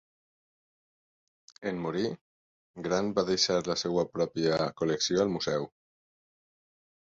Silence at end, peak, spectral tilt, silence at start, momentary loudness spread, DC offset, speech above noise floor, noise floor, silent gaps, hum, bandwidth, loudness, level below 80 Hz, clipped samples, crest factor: 1.5 s; -12 dBFS; -4 dB/octave; 1.6 s; 10 LU; under 0.1%; over 61 dB; under -90 dBFS; 2.21-2.74 s; none; 7.8 kHz; -30 LUFS; -64 dBFS; under 0.1%; 20 dB